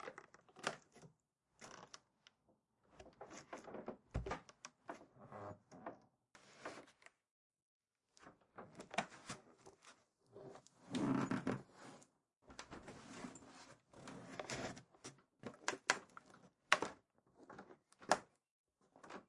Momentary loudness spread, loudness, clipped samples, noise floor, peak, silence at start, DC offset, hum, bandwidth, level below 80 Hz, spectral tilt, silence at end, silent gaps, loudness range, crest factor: 25 LU; -46 LUFS; under 0.1%; -81 dBFS; -12 dBFS; 0 s; under 0.1%; none; 11.5 kHz; -68 dBFS; -3.5 dB/octave; 0.05 s; 7.31-7.50 s, 7.62-7.80 s, 18.51-18.64 s; 14 LU; 38 dB